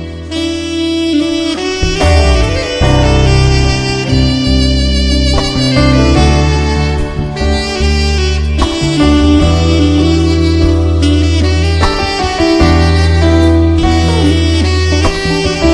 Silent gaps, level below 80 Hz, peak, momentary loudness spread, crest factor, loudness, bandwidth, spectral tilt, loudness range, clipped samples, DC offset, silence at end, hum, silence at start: none; -14 dBFS; 0 dBFS; 5 LU; 10 dB; -11 LUFS; 10.5 kHz; -6 dB/octave; 2 LU; under 0.1%; under 0.1%; 0 s; none; 0 s